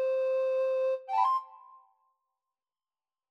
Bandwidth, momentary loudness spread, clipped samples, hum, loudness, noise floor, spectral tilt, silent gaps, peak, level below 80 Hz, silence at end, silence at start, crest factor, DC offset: 6.2 kHz; 3 LU; under 0.1%; none; -29 LUFS; under -90 dBFS; 0.5 dB/octave; none; -16 dBFS; under -90 dBFS; 1.75 s; 0 s; 16 dB; under 0.1%